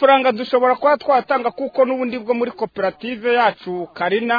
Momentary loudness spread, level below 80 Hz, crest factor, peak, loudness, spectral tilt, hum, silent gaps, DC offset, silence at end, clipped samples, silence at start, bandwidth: 8 LU; -64 dBFS; 16 dB; -2 dBFS; -19 LUFS; -7 dB/octave; none; none; under 0.1%; 0 s; under 0.1%; 0 s; 5 kHz